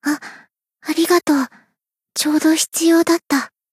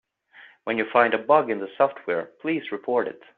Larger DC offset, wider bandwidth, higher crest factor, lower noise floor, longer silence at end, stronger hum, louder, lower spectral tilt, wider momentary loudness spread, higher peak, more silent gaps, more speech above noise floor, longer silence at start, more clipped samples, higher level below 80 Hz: neither; first, 15.5 kHz vs 4.5 kHz; second, 16 dB vs 22 dB; first, -72 dBFS vs -52 dBFS; about the same, 0.25 s vs 0.25 s; neither; first, -17 LUFS vs -24 LUFS; second, -1.5 dB/octave vs -3 dB/octave; first, 13 LU vs 9 LU; about the same, -4 dBFS vs -4 dBFS; neither; first, 57 dB vs 28 dB; second, 0.05 s vs 0.4 s; neither; about the same, -72 dBFS vs -72 dBFS